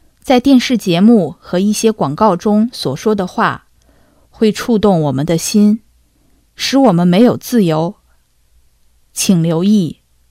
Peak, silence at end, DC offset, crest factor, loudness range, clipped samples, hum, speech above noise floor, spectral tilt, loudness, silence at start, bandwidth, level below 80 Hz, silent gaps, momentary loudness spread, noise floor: 0 dBFS; 0.4 s; under 0.1%; 14 dB; 3 LU; 0.2%; none; 42 dB; -5.5 dB/octave; -13 LUFS; 0.25 s; 16 kHz; -46 dBFS; none; 8 LU; -53 dBFS